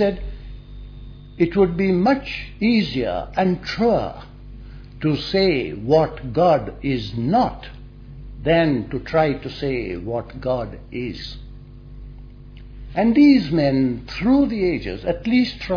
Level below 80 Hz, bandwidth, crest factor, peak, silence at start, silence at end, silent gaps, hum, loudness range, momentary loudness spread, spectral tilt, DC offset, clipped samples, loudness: -38 dBFS; 5.4 kHz; 16 dB; -4 dBFS; 0 s; 0 s; none; none; 6 LU; 23 LU; -8 dB/octave; under 0.1%; under 0.1%; -20 LUFS